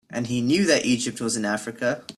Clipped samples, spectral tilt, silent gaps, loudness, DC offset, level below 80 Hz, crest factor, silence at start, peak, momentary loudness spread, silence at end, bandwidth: under 0.1%; -4 dB/octave; none; -23 LUFS; under 0.1%; -62 dBFS; 18 dB; 0.1 s; -6 dBFS; 8 LU; 0.05 s; 13.5 kHz